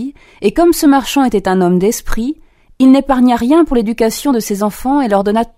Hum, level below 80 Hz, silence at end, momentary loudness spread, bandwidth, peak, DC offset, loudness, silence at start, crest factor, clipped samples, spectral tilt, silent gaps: none; -30 dBFS; 0.1 s; 9 LU; 16 kHz; 0 dBFS; under 0.1%; -12 LUFS; 0 s; 12 dB; under 0.1%; -5.5 dB/octave; none